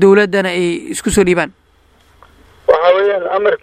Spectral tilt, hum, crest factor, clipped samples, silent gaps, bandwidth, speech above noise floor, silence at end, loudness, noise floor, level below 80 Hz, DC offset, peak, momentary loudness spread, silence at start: -5 dB/octave; none; 14 dB; under 0.1%; none; 15 kHz; 38 dB; 0.05 s; -14 LUFS; -51 dBFS; -40 dBFS; under 0.1%; 0 dBFS; 8 LU; 0 s